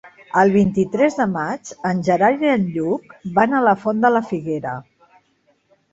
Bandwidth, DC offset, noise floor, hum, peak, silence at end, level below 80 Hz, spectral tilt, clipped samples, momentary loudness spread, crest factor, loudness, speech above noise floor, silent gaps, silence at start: 8 kHz; under 0.1%; -62 dBFS; none; -2 dBFS; 1.1 s; -54 dBFS; -7 dB/octave; under 0.1%; 10 LU; 18 dB; -18 LUFS; 44 dB; none; 0.05 s